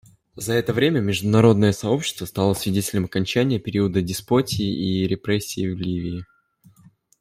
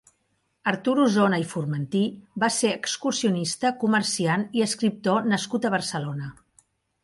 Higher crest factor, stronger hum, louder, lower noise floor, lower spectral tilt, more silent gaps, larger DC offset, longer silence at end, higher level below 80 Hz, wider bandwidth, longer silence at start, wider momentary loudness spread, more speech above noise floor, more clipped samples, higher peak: about the same, 18 dB vs 18 dB; neither; about the same, -22 LUFS vs -24 LUFS; second, -55 dBFS vs -72 dBFS; about the same, -5.5 dB/octave vs -4.5 dB/octave; neither; neither; first, 0.95 s vs 0.7 s; first, -52 dBFS vs -66 dBFS; first, 16 kHz vs 11.5 kHz; second, 0.35 s vs 0.65 s; first, 10 LU vs 7 LU; second, 34 dB vs 48 dB; neither; about the same, -4 dBFS vs -6 dBFS